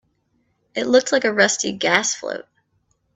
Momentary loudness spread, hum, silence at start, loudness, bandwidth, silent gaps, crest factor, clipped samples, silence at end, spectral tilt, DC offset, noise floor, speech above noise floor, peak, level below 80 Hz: 14 LU; none; 0.75 s; -19 LUFS; 8.4 kHz; none; 20 dB; under 0.1%; 0.75 s; -2 dB/octave; under 0.1%; -67 dBFS; 48 dB; 0 dBFS; -64 dBFS